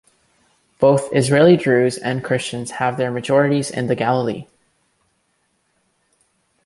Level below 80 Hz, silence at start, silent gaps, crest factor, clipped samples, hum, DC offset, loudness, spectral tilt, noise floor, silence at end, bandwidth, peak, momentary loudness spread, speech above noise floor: -58 dBFS; 0.8 s; none; 18 dB; under 0.1%; none; under 0.1%; -18 LUFS; -6 dB/octave; -66 dBFS; 2.2 s; 11.5 kHz; -2 dBFS; 10 LU; 50 dB